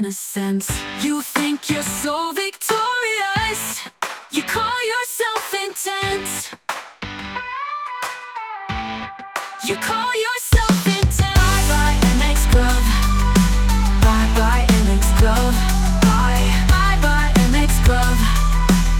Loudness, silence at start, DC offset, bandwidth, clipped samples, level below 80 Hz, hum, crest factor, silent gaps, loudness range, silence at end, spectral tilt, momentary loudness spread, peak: -19 LUFS; 0 s; under 0.1%; 18 kHz; under 0.1%; -20 dBFS; none; 14 dB; none; 9 LU; 0 s; -4.5 dB/octave; 11 LU; -4 dBFS